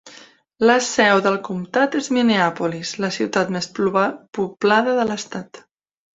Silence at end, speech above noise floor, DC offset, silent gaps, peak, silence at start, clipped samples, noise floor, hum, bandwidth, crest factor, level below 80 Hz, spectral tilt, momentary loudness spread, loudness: 0.55 s; 28 dB; under 0.1%; none; -2 dBFS; 0.05 s; under 0.1%; -47 dBFS; none; 8 kHz; 18 dB; -62 dBFS; -4 dB/octave; 9 LU; -19 LUFS